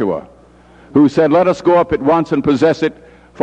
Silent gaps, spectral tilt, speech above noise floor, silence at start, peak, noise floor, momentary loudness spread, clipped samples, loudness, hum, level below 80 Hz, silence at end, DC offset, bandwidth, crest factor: none; -7.5 dB/octave; 32 dB; 0 s; 0 dBFS; -44 dBFS; 8 LU; under 0.1%; -14 LUFS; 60 Hz at -40 dBFS; -44 dBFS; 0 s; under 0.1%; 8.6 kHz; 14 dB